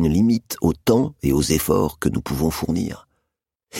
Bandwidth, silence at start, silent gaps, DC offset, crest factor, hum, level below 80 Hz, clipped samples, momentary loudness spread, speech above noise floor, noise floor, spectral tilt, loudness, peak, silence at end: 16.5 kHz; 0 s; none; under 0.1%; 18 dB; none; -38 dBFS; under 0.1%; 6 LU; 59 dB; -80 dBFS; -6 dB/octave; -21 LUFS; -4 dBFS; 0 s